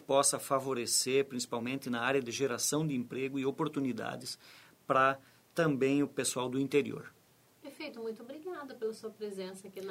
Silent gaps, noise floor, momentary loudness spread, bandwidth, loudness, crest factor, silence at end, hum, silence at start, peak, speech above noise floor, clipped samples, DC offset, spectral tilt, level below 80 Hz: none; -58 dBFS; 16 LU; 16 kHz; -33 LUFS; 20 dB; 0 s; none; 0 s; -14 dBFS; 25 dB; under 0.1%; under 0.1%; -3.5 dB/octave; -76 dBFS